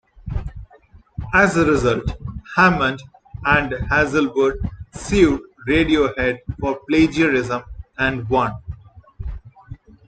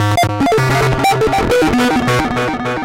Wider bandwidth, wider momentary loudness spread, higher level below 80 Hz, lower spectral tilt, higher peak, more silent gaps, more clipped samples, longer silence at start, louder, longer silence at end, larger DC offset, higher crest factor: second, 9.2 kHz vs 17 kHz; first, 19 LU vs 3 LU; about the same, -36 dBFS vs -32 dBFS; about the same, -6 dB/octave vs -5.5 dB/octave; first, -2 dBFS vs -6 dBFS; neither; neither; first, 0.2 s vs 0 s; second, -19 LUFS vs -14 LUFS; first, 0.3 s vs 0 s; second, under 0.1% vs 0.5%; first, 18 dB vs 8 dB